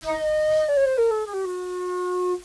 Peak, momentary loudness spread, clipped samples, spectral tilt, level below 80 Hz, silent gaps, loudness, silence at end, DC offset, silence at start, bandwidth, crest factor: -12 dBFS; 9 LU; under 0.1%; -4 dB/octave; -54 dBFS; none; -23 LUFS; 0 s; under 0.1%; 0 s; 11 kHz; 10 dB